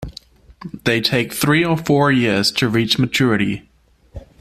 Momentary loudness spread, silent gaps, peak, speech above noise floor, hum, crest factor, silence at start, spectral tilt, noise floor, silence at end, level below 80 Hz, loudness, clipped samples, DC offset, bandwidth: 13 LU; none; -2 dBFS; 26 dB; none; 16 dB; 0 s; -5 dB/octave; -43 dBFS; 0.2 s; -44 dBFS; -17 LUFS; under 0.1%; under 0.1%; 15.5 kHz